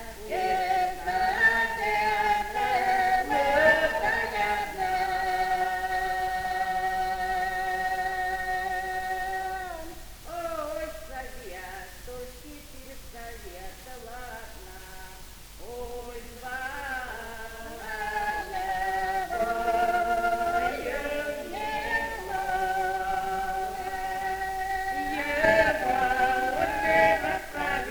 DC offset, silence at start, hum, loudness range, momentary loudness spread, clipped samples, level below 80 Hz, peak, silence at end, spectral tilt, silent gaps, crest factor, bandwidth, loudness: under 0.1%; 0 s; none; 17 LU; 19 LU; under 0.1%; -46 dBFS; -8 dBFS; 0 s; -3.5 dB/octave; none; 20 dB; over 20 kHz; -27 LUFS